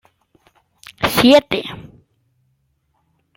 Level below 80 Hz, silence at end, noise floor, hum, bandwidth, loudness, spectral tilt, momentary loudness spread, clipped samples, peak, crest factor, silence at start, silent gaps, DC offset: -50 dBFS; 1.55 s; -66 dBFS; none; 16.5 kHz; -14 LUFS; -4.5 dB/octave; 20 LU; under 0.1%; 0 dBFS; 20 dB; 1 s; none; under 0.1%